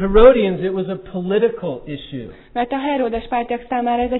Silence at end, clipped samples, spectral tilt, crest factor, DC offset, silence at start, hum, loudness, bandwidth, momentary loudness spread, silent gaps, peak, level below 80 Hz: 0 s; under 0.1%; -10.5 dB/octave; 18 dB; under 0.1%; 0 s; none; -18 LUFS; 4.1 kHz; 18 LU; none; 0 dBFS; -30 dBFS